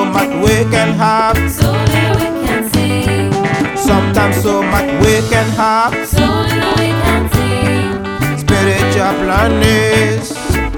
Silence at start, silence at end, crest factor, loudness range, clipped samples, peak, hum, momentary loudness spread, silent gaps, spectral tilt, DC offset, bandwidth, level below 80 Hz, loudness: 0 s; 0 s; 12 dB; 1 LU; under 0.1%; 0 dBFS; none; 4 LU; none; -5.5 dB/octave; under 0.1%; 20 kHz; -26 dBFS; -12 LUFS